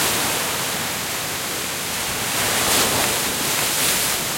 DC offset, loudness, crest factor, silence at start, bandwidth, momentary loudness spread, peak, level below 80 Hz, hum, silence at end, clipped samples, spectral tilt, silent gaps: under 0.1%; -19 LUFS; 18 dB; 0 s; 16.5 kHz; 7 LU; -4 dBFS; -48 dBFS; none; 0 s; under 0.1%; -1 dB/octave; none